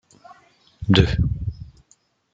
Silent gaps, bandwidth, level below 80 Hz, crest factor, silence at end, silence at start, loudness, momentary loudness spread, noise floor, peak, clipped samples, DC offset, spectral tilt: none; 7.8 kHz; -34 dBFS; 22 dB; 0.65 s; 0.8 s; -21 LUFS; 15 LU; -61 dBFS; -2 dBFS; under 0.1%; under 0.1%; -7 dB/octave